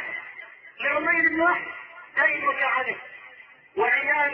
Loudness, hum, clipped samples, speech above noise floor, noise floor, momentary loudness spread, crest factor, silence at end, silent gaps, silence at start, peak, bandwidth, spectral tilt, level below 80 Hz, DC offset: -23 LUFS; none; under 0.1%; 26 dB; -49 dBFS; 20 LU; 18 dB; 0 s; none; 0 s; -8 dBFS; 6 kHz; -6 dB/octave; -68 dBFS; under 0.1%